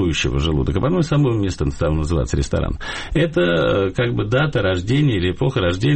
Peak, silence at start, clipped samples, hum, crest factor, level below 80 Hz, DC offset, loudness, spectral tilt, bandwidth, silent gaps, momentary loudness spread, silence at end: -8 dBFS; 0 s; under 0.1%; none; 12 dB; -30 dBFS; under 0.1%; -19 LUFS; -6.5 dB/octave; 8.6 kHz; none; 5 LU; 0 s